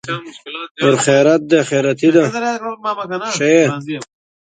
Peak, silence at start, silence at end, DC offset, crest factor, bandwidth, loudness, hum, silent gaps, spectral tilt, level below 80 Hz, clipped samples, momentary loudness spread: 0 dBFS; 0.05 s; 0.55 s; under 0.1%; 16 dB; 9.4 kHz; -15 LUFS; none; 0.71-0.75 s; -5 dB/octave; -62 dBFS; under 0.1%; 15 LU